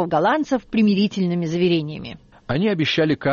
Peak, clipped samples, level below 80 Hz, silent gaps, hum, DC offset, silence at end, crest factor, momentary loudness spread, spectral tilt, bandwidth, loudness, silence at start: -8 dBFS; under 0.1%; -52 dBFS; none; none; under 0.1%; 0 s; 12 dB; 13 LU; -5 dB/octave; 7.2 kHz; -20 LUFS; 0 s